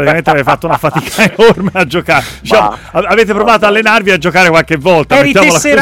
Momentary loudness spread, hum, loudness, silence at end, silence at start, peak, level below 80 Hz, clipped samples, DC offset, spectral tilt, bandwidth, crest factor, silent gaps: 6 LU; none; -8 LUFS; 0 s; 0 s; 0 dBFS; -36 dBFS; 0.1%; under 0.1%; -4.5 dB/octave; 17 kHz; 8 dB; none